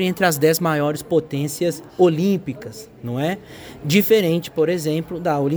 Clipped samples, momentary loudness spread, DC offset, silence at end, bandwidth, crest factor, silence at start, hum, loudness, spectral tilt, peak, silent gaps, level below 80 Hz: under 0.1%; 15 LU; under 0.1%; 0 s; over 20 kHz; 18 dB; 0 s; none; -20 LUFS; -5.5 dB/octave; -2 dBFS; none; -56 dBFS